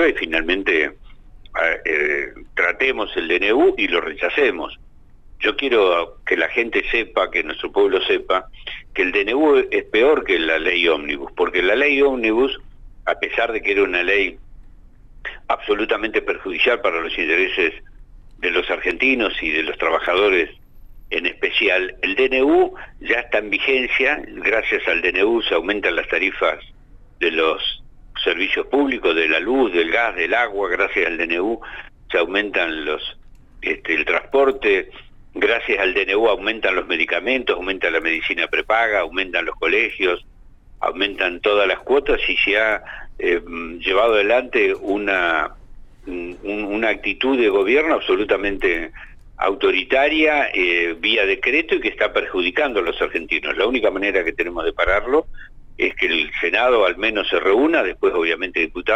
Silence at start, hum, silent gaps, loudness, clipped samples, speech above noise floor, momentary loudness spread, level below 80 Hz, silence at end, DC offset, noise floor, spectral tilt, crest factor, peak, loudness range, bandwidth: 0 s; none; none; -18 LUFS; under 0.1%; 24 dB; 8 LU; -42 dBFS; 0 s; under 0.1%; -43 dBFS; -4.5 dB/octave; 16 dB; -4 dBFS; 3 LU; 8 kHz